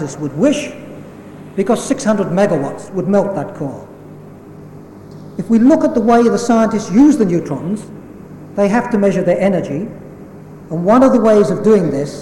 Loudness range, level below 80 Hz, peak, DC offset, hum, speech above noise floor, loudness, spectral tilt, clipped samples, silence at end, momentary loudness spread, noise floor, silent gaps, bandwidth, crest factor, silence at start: 5 LU; -46 dBFS; -2 dBFS; under 0.1%; none; 22 dB; -14 LUFS; -7 dB/octave; under 0.1%; 0 s; 23 LU; -35 dBFS; none; 15 kHz; 14 dB; 0 s